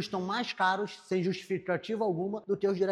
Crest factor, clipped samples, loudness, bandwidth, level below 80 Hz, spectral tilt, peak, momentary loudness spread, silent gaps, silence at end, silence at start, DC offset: 16 dB; under 0.1%; -32 LUFS; 11.5 kHz; -74 dBFS; -6 dB/octave; -16 dBFS; 5 LU; none; 0 s; 0 s; under 0.1%